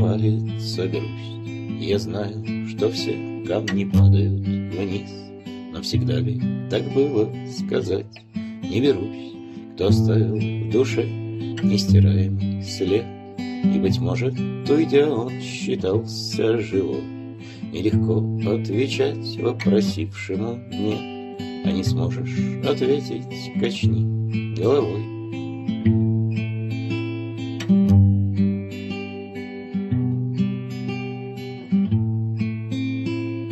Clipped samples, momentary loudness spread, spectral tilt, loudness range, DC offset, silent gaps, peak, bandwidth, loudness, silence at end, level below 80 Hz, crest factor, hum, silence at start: under 0.1%; 12 LU; -7.5 dB/octave; 4 LU; under 0.1%; none; -4 dBFS; 12 kHz; -23 LUFS; 0 s; -56 dBFS; 18 dB; none; 0 s